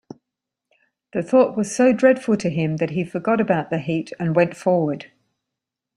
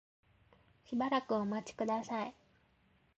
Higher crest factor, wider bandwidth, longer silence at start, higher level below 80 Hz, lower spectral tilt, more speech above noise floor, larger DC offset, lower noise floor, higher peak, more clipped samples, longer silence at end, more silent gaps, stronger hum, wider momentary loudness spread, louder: about the same, 18 dB vs 18 dB; first, 11.5 kHz vs 8.2 kHz; first, 1.15 s vs 0.9 s; first, -62 dBFS vs -74 dBFS; about the same, -6.5 dB/octave vs -5.5 dB/octave; first, 65 dB vs 35 dB; neither; first, -84 dBFS vs -72 dBFS; first, -4 dBFS vs -22 dBFS; neither; about the same, 0.9 s vs 0.9 s; neither; neither; about the same, 9 LU vs 7 LU; first, -20 LUFS vs -37 LUFS